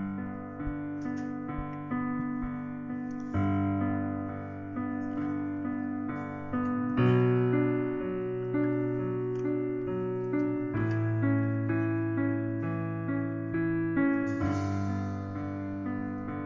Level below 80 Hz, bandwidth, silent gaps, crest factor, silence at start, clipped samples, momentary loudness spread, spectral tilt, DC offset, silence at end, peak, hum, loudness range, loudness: -52 dBFS; 7.4 kHz; none; 16 dB; 0 s; under 0.1%; 9 LU; -9.5 dB/octave; under 0.1%; 0 s; -14 dBFS; none; 4 LU; -31 LUFS